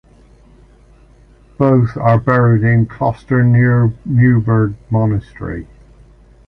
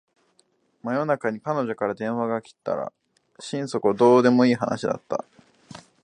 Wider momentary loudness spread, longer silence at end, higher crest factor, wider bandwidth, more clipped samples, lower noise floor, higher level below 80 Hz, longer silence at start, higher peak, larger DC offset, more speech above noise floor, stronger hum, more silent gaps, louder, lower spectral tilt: second, 10 LU vs 15 LU; first, 0.85 s vs 0.25 s; second, 14 dB vs 20 dB; second, 3.9 kHz vs 10 kHz; neither; second, -45 dBFS vs -65 dBFS; first, -38 dBFS vs -68 dBFS; first, 1.6 s vs 0.85 s; about the same, -2 dBFS vs -4 dBFS; neither; second, 32 dB vs 43 dB; neither; neither; first, -14 LUFS vs -23 LUFS; first, -11 dB/octave vs -6.5 dB/octave